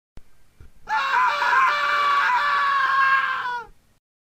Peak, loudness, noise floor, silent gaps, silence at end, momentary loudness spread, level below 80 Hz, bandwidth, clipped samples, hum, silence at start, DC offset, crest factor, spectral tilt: -8 dBFS; -20 LUFS; -46 dBFS; none; 0.75 s; 9 LU; -56 dBFS; 16 kHz; under 0.1%; none; 0.15 s; under 0.1%; 16 dB; -0.5 dB/octave